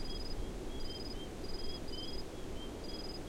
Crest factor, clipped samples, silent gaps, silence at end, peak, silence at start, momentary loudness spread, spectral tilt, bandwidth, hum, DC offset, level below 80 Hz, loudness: 12 dB; under 0.1%; none; 0 s; -28 dBFS; 0 s; 2 LU; -4.5 dB/octave; 16 kHz; none; under 0.1%; -44 dBFS; -44 LUFS